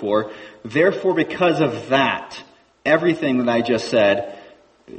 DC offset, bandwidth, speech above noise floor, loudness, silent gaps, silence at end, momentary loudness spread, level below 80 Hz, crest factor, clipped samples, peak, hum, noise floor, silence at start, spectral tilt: under 0.1%; 8.6 kHz; 28 dB; -19 LUFS; none; 0 s; 15 LU; -60 dBFS; 18 dB; under 0.1%; -2 dBFS; none; -47 dBFS; 0 s; -6 dB/octave